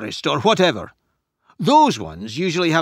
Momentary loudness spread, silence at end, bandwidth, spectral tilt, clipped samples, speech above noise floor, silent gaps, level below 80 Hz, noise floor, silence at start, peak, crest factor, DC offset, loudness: 15 LU; 0 s; 15.5 kHz; -5 dB/octave; under 0.1%; 45 dB; none; -54 dBFS; -63 dBFS; 0 s; -2 dBFS; 18 dB; under 0.1%; -18 LUFS